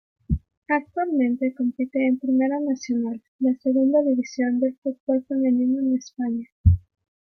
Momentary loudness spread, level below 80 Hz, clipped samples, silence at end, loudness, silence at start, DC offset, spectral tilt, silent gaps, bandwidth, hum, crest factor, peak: 7 LU; -40 dBFS; under 0.1%; 0.6 s; -23 LUFS; 0.3 s; under 0.1%; -8 dB/octave; 0.57-0.62 s, 3.28-3.39 s, 4.78-4.82 s, 5.00-5.07 s, 6.52-6.64 s; 6.6 kHz; none; 18 dB; -6 dBFS